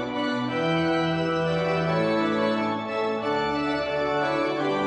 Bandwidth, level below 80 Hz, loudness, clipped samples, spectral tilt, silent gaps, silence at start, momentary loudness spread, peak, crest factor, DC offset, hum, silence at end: 9.4 kHz; -58 dBFS; -25 LUFS; under 0.1%; -6.5 dB/octave; none; 0 s; 3 LU; -12 dBFS; 14 dB; under 0.1%; none; 0 s